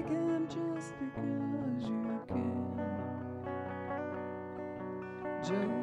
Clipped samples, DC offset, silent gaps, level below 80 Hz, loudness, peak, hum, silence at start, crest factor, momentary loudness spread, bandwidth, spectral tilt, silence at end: under 0.1%; under 0.1%; none; -66 dBFS; -38 LUFS; -22 dBFS; none; 0 s; 14 dB; 8 LU; 10.5 kHz; -7.5 dB/octave; 0 s